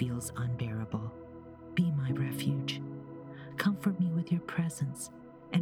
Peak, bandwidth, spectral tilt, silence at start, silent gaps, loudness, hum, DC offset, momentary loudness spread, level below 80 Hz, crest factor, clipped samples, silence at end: -16 dBFS; 16.5 kHz; -6 dB/octave; 0 s; none; -34 LUFS; none; under 0.1%; 15 LU; -62 dBFS; 18 dB; under 0.1%; 0 s